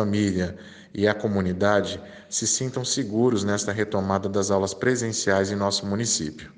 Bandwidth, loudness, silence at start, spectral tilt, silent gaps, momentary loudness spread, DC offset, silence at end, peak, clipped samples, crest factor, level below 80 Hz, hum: 10.5 kHz; -24 LUFS; 0 s; -4 dB/octave; none; 6 LU; under 0.1%; 0.05 s; -6 dBFS; under 0.1%; 18 dB; -60 dBFS; none